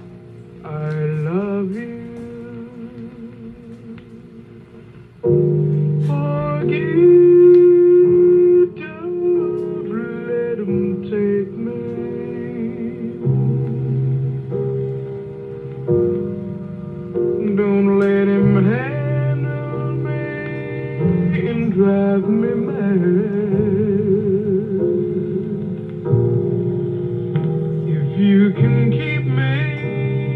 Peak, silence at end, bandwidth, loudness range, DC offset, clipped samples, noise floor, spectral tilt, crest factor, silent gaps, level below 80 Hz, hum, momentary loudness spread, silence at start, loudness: -2 dBFS; 0 s; 4.1 kHz; 11 LU; under 0.1%; under 0.1%; -40 dBFS; -11 dB/octave; 14 dB; none; -52 dBFS; none; 18 LU; 0 s; -18 LUFS